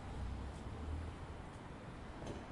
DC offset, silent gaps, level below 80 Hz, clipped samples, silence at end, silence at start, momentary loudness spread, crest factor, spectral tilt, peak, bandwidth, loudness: under 0.1%; none; -50 dBFS; under 0.1%; 0 s; 0 s; 5 LU; 12 dB; -6.5 dB/octave; -34 dBFS; 11.5 kHz; -49 LUFS